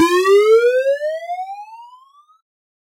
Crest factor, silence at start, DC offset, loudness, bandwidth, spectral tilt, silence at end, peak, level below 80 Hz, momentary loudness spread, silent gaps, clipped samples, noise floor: 14 dB; 0 s; under 0.1%; -15 LUFS; 16 kHz; -2.5 dB/octave; 1.15 s; -4 dBFS; -82 dBFS; 17 LU; none; under 0.1%; -48 dBFS